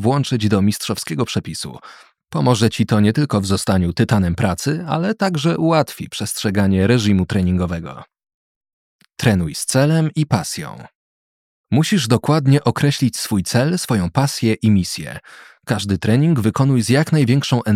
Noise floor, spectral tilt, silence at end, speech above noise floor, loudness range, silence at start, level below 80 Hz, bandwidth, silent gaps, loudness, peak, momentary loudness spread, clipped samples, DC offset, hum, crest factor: under -90 dBFS; -6 dB/octave; 0 s; over 73 dB; 3 LU; 0 s; -50 dBFS; 16 kHz; 8.34-8.61 s, 8.73-8.99 s, 10.95-11.64 s; -18 LUFS; -2 dBFS; 9 LU; under 0.1%; under 0.1%; none; 16 dB